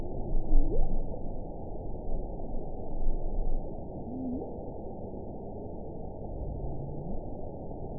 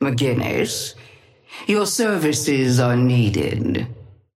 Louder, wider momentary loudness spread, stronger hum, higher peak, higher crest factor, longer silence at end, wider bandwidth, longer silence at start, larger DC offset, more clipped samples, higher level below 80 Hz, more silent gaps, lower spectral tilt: second, -39 LUFS vs -19 LUFS; second, 8 LU vs 11 LU; neither; second, -10 dBFS vs -6 dBFS; about the same, 18 dB vs 14 dB; second, 0 s vs 0.3 s; second, 1 kHz vs 15.5 kHz; about the same, 0 s vs 0 s; first, 0.6% vs under 0.1%; neither; first, -32 dBFS vs -50 dBFS; neither; first, -16 dB/octave vs -5 dB/octave